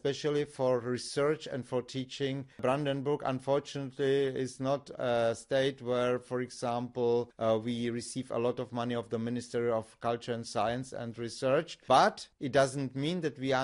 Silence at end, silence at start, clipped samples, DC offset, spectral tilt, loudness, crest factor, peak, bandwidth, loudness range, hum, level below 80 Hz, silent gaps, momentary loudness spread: 0 s; 0.05 s; under 0.1%; under 0.1%; -5.5 dB/octave; -32 LUFS; 20 dB; -12 dBFS; 11 kHz; 3 LU; none; -68 dBFS; none; 7 LU